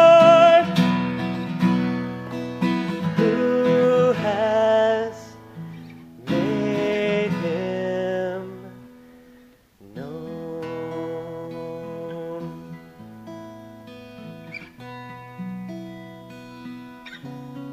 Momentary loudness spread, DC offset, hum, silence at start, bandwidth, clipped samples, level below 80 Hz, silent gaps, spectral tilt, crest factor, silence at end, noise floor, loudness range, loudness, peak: 22 LU; under 0.1%; none; 0 s; 13.5 kHz; under 0.1%; -60 dBFS; none; -7 dB/octave; 20 dB; 0 s; -52 dBFS; 17 LU; -21 LUFS; -2 dBFS